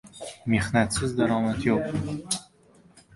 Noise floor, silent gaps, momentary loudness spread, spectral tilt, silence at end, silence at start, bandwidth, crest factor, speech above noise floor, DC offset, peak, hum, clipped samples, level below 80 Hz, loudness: -57 dBFS; none; 7 LU; -5 dB/octave; 0.75 s; 0.05 s; 11.5 kHz; 20 dB; 32 dB; under 0.1%; -8 dBFS; none; under 0.1%; -48 dBFS; -26 LUFS